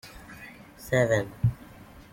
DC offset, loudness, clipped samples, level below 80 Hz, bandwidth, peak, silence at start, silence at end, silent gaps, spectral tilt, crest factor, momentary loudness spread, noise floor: under 0.1%; -27 LUFS; under 0.1%; -48 dBFS; 16.5 kHz; -10 dBFS; 0.05 s; 0.15 s; none; -6.5 dB/octave; 20 dB; 22 LU; -48 dBFS